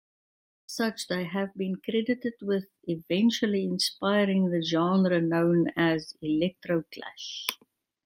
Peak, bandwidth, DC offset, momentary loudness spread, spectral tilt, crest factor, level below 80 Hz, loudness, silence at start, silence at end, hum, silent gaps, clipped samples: -8 dBFS; 16 kHz; under 0.1%; 10 LU; -5.5 dB/octave; 20 dB; -68 dBFS; -28 LUFS; 0.7 s; 0.5 s; none; none; under 0.1%